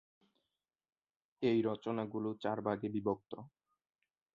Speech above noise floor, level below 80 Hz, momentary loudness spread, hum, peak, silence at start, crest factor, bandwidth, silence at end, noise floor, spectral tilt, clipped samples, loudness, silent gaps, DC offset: 53 dB; -76 dBFS; 9 LU; none; -20 dBFS; 1.4 s; 20 dB; 7 kHz; 0.85 s; -90 dBFS; -6 dB/octave; under 0.1%; -37 LUFS; none; under 0.1%